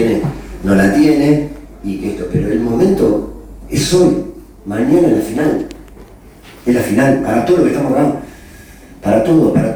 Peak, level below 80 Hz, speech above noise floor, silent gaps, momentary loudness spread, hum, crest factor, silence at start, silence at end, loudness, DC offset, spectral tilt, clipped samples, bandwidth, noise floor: -2 dBFS; -36 dBFS; 26 dB; none; 14 LU; none; 12 dB; 0 s; 0 s; -14 LUFS; under 0.1%; -6.5 dB/octave; under 0.1%; 20 kHz; -38 dBFS